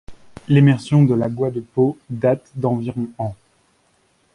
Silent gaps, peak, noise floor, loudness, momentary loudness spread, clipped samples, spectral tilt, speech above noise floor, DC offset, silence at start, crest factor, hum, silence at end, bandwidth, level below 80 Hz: none; -2 dBFS; -61 dBFS; -19 LUFS; 12 LU; under 0.1%; -9 dB/octave; 43 dB; under 0.1%; 0.1 s; 16 dB; none; 1 s; 10.5 kHz; -52 dBFS